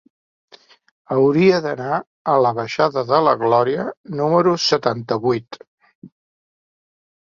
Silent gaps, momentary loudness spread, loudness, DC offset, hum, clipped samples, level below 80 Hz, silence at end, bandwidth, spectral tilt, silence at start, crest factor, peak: 2.07-2.25 s, 3.97-4.04 s, 5.67-5.78 s, 5.95-6.02 s; 8 LU; -18 LUFS; under 0.1%; none; under 0.1%; -62 dBFS; 1.35 s; 7.4 kHz; -6 dB/octave; 1.1 s; 18 dB; -2 dBFS